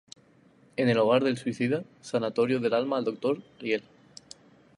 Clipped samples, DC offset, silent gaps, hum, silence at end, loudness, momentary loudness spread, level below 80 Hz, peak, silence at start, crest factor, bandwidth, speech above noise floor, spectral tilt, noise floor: under 0.1%; under 0.1%; none; none; 0.95 s; -28 LUFS; 10 LU; -74 dBFS; -10 dBFS; 0.8 s; 20 dB; 11 kHz; 33 dB; -6 dB/octave; -60 dBFS